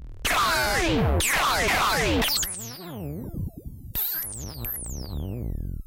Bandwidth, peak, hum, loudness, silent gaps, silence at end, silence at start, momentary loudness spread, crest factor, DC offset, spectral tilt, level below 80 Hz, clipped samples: 17 kHz; -14 dBFS; none; -25 LUFS; none; 0 s; 0 s; 14 LU; 12 dB; under 0.1%; -3 dB/octave; -36 dBFS; under 0.1%